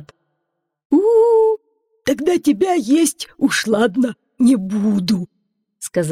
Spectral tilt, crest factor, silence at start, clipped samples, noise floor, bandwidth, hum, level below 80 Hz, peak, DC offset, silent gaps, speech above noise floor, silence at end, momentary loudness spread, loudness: -5 dB/octave; 12 dB; 0 s; under 0.1%; -75 dBFS; 16 kHz; none; -58 dBFS; -6 dBFS; under 0.1%; 0.85-0.90 s; 58 dB; 0 s; 10 LU; -17 LUFS